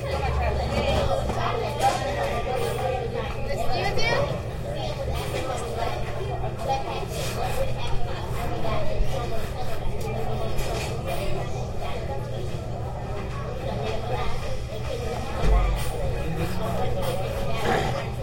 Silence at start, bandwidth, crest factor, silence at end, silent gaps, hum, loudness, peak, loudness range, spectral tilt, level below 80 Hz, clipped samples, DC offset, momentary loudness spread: 0 s; 16.5 kHz; 16 dB; 0 s; none; none; -28 LUFS; -10 dBFS; 5 LU; -5.5 dB/octave; -32 dBFS; under 0.1%; under 0.1%; 8 LU